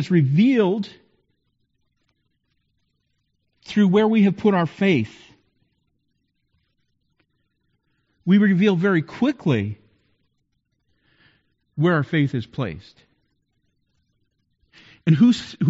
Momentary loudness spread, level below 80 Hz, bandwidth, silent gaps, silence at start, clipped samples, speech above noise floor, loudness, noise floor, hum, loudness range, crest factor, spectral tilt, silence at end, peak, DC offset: 14 LU; -62 dBFS; 7.8 kHz; none; 0 s; under 0.1%; 53 dB; -20 LUFS; -72 dBFS; none; 7 LU; 18 dB; -6.5 dB/octave; 0 s; -6 dBFS; under 0.1%